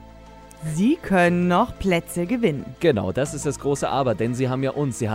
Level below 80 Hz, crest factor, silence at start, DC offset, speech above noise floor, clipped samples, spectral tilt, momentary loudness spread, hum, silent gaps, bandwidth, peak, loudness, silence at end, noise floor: -44 dBFS; 18 dB; 0 s; under 0.1%; 22 dB; under 0.1%; -6 dB/octave; 7 LU; none; none; 16 kHz; -4 dBFS; -22 LUFS; 0 s; -44 dBFS